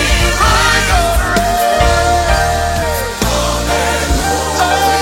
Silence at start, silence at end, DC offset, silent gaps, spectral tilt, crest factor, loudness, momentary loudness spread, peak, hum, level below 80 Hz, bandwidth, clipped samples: 0 s; 0 s; under 0.1%; none; -3.5 dB/octave; 12 dB; -13 LUFS; 5 LU; 0 dBFS; none; -18 dBFS; 16.5 kHz; under 0.1%